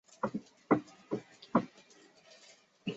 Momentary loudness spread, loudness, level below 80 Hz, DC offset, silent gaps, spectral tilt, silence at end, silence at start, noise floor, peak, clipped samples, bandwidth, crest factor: 24 LU; -36 LUFS; -76 dBFS; under 0.1%; none; -6 dB/octave; 0 s; 0.25 s; -62 dBFS; -12 dBFS; under 0.1%; 8 kHz; 26 dB